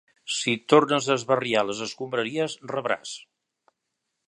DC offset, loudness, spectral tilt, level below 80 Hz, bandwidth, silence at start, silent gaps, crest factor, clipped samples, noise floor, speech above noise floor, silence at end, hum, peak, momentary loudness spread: under 0.1%; -25 LUFS; -3.5 dB/octave; -72 dBFS; 11.5 kHz; 0.25 s; none; 24 dB; under 0.1%; -81 dBFS; 56 dB; 1.05 s; none; -2 dBFS; 11 LU